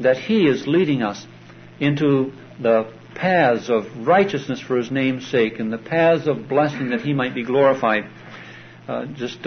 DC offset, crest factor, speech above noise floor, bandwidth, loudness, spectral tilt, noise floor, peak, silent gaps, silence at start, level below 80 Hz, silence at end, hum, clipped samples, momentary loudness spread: under 0.1%; 16 dB; 21 dB; 6.6 kHz; -20 LUFS; -7 dB/octave; -40 dBFS; -4 dBFS; none; 0 s; -62 dBFS; 0 s; none; under 0.1%; 12 LU